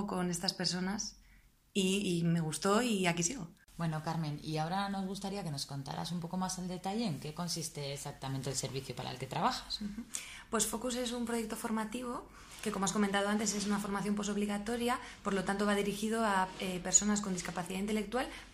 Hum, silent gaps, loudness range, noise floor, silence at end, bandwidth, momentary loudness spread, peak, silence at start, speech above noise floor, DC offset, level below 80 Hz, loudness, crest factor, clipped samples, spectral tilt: none; none; 6 LU; -63 dBFS; 0 s; 15.5 kHz; 9 LU; -14 dBFS; 0 s; 28 dB; under 0.1%; -60 dBFS; -35 LUFS; 22 dB; under 0.1%; -4 dB/octave